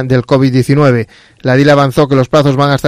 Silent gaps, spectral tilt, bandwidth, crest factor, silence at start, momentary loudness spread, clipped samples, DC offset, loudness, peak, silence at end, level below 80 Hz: none; -7 dB/octave; 14.5 kHz; 10 dB; 0 s; 7 LU; 0.3%; under 0.1%; -10 LUFS; 0 dBFS; 0 s; -42 dBFS